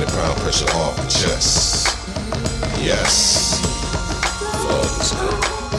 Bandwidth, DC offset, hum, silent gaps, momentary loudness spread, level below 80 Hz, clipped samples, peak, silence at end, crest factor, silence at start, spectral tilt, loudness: 15 kHz; under 0.1%; none; none; 9 LU; -28 dBFS; under 0.1%; -2 dBFS; 0 s; 16 dB; 0 s; -2.5 dB/octave; -18 LUFS